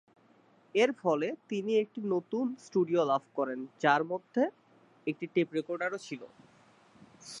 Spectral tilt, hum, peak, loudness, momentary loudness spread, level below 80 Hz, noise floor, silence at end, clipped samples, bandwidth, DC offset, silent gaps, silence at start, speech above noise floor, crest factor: -5.5 dB/octave; none; -10 dBFS; -32 LUFS; 11 LU; -86 dBFS; -64 dBFS; 0 s; under 0.1%; 11.5 kHz; under 0.1%; none; 0.75 s; 33 dB; 22 dB